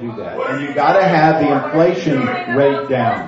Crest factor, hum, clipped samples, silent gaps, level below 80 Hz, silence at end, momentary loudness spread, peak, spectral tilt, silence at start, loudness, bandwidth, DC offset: 14 dB; none; under 0.1%; none; -56 dBFS; 0 s; 9 LU; 0 dBFS; -7.5 dB/octave; 0 s; -15 LUFS; 7.8 kHz; under 0.1%